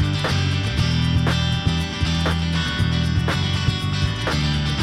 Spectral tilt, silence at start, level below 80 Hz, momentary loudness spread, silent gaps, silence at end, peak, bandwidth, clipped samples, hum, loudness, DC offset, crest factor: -5.5 dB/octave; 0 s; -30 dBFS; 3 LU; none; 0 s; -6 dBFS; 13.5 kHz; under 0.1%; none; -21 LUFS; under 0.1%; 14 dB